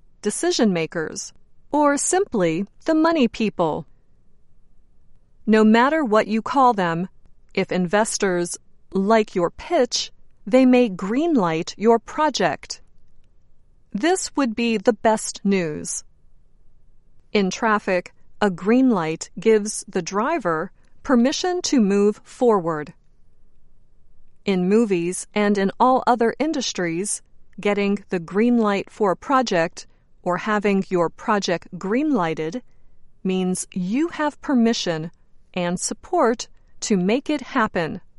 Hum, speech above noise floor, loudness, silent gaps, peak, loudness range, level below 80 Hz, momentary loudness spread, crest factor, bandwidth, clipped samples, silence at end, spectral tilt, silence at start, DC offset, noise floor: none; 29 dB; -21 LUFS; none; -4 dBFS; 4 LU; -52 dBFS; 11 LU; 18 dB; 11.5 kHz; under 0.1%; 0.15 s; -4.5 dB/octave; 0.25 s; under 0.1%; -49 dBFS